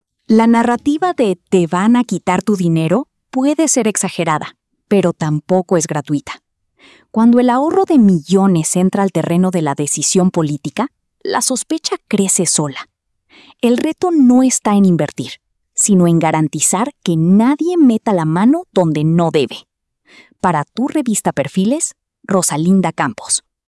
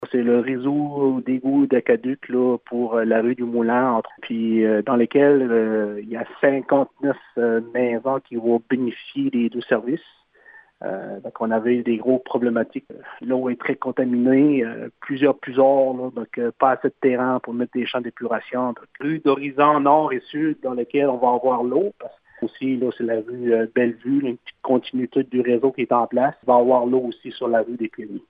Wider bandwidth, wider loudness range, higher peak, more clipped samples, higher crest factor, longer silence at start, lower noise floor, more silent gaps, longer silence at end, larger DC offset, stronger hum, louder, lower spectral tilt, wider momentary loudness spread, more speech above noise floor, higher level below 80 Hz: first, 12 kHz vs 4.8 kHz; about the same, 4 LU vs 4 LU; about the same, -2 dBFS vs -2 dBFS; neither; second, 12 dB vs 20 dB; first, 0.3 s vs 0 s; about the same, -50 dBFS vs -50 dBFS; neither; first, 0.3 s vs 0.1 s; neither; neither; first, -14 LUFS vs -21 LUFS; second, -5 dB/octave vs -10 dB/octave; about the same, 9 LU vs 11 LU; first, 37 dB vs 29 dB; first, -58 dBFS vs -70 dBFS